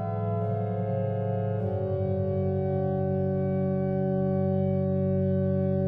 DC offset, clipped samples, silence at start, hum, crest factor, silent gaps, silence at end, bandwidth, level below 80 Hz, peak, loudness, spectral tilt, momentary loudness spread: under 0.1%; under 0.1%; 0 s; none; 10 dB; none; 0 s; 3.6 kHz; -58 dBFS; -16 dBFS; -28 LUFS; -13 dB/octave; 3 LU